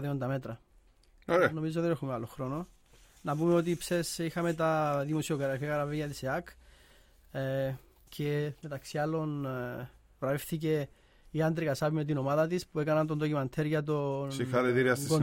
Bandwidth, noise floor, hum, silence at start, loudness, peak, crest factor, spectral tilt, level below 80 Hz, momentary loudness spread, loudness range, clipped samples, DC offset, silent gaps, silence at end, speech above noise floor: 17 kHz; -62 dBFS; none; 0 s; -32 LUFS; -12 dBFS; 20 dB; -6 dB/octave; -60 dBFS; 12 LU; 5 LU; under 0.1%; under 0.1%; none; 0 s; 31 dB